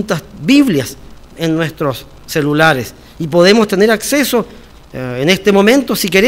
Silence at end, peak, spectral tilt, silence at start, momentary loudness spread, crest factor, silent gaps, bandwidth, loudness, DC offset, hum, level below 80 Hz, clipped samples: 0 s; 0 dBFS; -4.5 dB/octave; 0 s; 16 LU; 12 dB; none; 16.5 kHz; -12 LUFS; under 0.1%; none; -42 dBFS; 0.5%